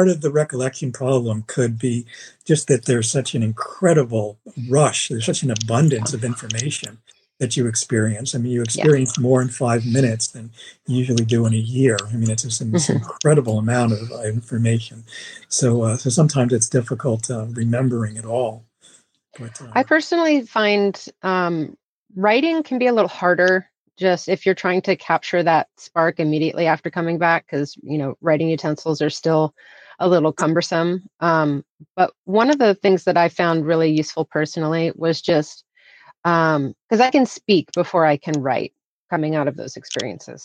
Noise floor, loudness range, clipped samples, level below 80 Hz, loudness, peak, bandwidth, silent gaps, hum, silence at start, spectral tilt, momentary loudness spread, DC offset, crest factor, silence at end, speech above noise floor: -53 dBFS; 3 LU; under 0.1%; -62 dBFS; -19 LUFS; -4 dBFS; 11 kHz; 21.84-22.06 s, 23.78-23.86 s, 31.69-31.78 s, 31.90-31.95 s, 32.18-32.24 s, 36.18-36.23 s, 36.82-36.89 s, 38.84-39.09 s; none; 0 s; -5 dB/octave; 9 LU; under 0.1%; 16 dB; 0 s; 34 dB